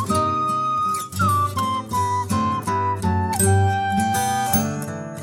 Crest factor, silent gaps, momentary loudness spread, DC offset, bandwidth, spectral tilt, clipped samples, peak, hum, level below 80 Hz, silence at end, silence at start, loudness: 16 dB; none; 5 LU; under 0.1%; 17 kHz; -5 dB/octave; under 0.1%; -4 dBFS; none; -48 dBFS; 0 s; 0 s; -21 LUFS